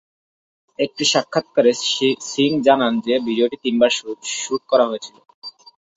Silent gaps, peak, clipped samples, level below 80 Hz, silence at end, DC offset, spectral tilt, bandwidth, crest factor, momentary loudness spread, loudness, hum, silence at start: 5.34-5.42 s; -2 dBFS; under 0.1%; -64 dBFS; 0.45 s; under 0.1%; -3 dB/octave; 8 kHz; 18 dB; 15 LU; -18 LUFS; none; 0.8 s